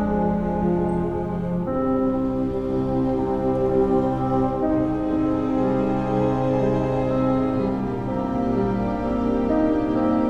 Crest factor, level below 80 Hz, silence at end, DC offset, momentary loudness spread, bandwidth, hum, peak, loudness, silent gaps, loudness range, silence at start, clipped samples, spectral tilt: 12 dB; -38 dBFS; 0 s; under 0.1%; 4 LU; 7.2 kHz; none; -8 dBFS; -22 LUFS; none; 1 LU; 0 s; under 0.1%; -9.5 dB/octave